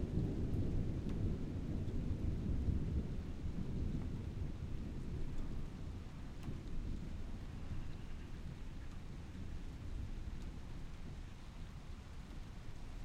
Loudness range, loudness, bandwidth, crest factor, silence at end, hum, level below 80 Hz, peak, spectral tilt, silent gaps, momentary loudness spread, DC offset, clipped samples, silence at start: 9 LU; -45 LUFS; 9.6 kHz; 16 dB; 0 s; none; -44 dBFS; -26 dBFS; -8 dB/octave; none; 12 LU; under 0.1%; under 0.1%; 0 s